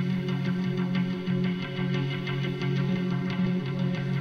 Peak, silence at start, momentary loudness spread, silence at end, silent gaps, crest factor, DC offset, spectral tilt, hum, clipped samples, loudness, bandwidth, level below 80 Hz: -16 dBFS; 0 s; 2 LU; 0 s; none; 12 dB; under 0.1%; -8 dB/octave; none; under 0.1%; -28 LUFS; 6.6 kHz; -60 dBFS